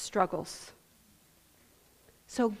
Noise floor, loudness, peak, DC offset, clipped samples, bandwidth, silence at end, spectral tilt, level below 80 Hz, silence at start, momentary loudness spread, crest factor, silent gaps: -64 dBFS; -34 LUFS; -12 dBFS; under 0.1%; under 0.1%; 15.5 kHz; 0 s; -4.5 dB/octave; -66 dBFS; 0 s; 16 LU; 24 dB; none